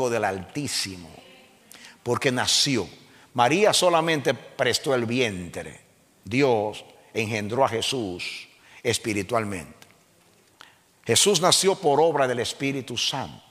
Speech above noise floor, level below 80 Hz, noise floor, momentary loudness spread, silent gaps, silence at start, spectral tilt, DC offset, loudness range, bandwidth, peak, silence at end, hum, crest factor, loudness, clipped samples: 35 dB; -62 dBFS; -59 dBFS; 15 LU; none; 0 s; -3 dB/octave; under 0.1%; 5 LU; 16 kHz; -4 dBFS; 0.15 s; none; 22 dB; -23 LUFS; under 0.1%